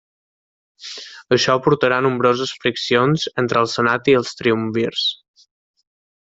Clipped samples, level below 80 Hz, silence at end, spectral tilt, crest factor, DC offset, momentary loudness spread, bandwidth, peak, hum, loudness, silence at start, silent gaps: under 0.1%; -58 dBFS; 1.15 s; -5 dB/octave; 18 dB; under 0.1%; 16 LU; 8 kHz; -2 dBFS; none; -18 LUFS; 0.8 s; none